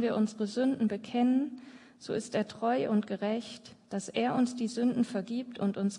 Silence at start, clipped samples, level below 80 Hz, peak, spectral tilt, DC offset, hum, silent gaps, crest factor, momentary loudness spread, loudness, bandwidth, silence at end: 0 s; under 0.1%; -78 dBFS; -16 dBFS; -6 dB/octave; under 0.1%; none; none; 16 dB; 10 LU; -31 LUFS; 11 kHz; 0 s